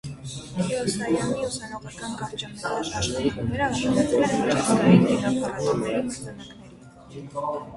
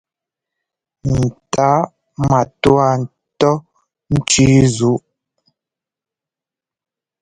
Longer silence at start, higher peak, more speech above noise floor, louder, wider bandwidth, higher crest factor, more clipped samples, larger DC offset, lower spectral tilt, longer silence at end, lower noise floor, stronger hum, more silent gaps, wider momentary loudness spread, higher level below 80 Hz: second, 0.05 s vs 1.05 s; second, -4 dBFS vs 0 dBFS; second, 22 dB vs 74 dB; second, -24 LUFS vs -15 LUFS; about the same, 11.5 kHz vs 11 kHz; about the same, 20 dB vs 18 dB; neither; neither; about the same, -5.5 dB/octave vs -5.5 dB/octave; second, 0 s vs 2.25 s; second, -46 dBFS vs -88 dBFS; neither; neither; first, 17 LU vs 12 LU; second, -48 dBFS vs -40 dBFS